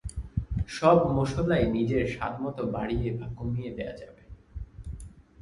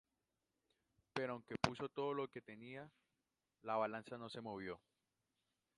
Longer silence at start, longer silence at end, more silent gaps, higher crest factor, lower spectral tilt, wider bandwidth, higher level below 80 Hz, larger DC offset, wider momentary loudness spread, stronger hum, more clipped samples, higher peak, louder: second, 0.05 s vs 1.15 s; second, 0.2 s vs 1 s; neither; second, 22 dB vs 30 dB; first, -7.5 dB/octave vs -5.5 dB/octave; about the same, 11.5 kHz vs 11 kHz; first, -40 dBFS vs -76 dBFS; neither; first, 22 LU vs 13 LU; neither; neither; first, -6 dBFS vs -16 dBFS; first, -28 LUFS vs -46 LUFS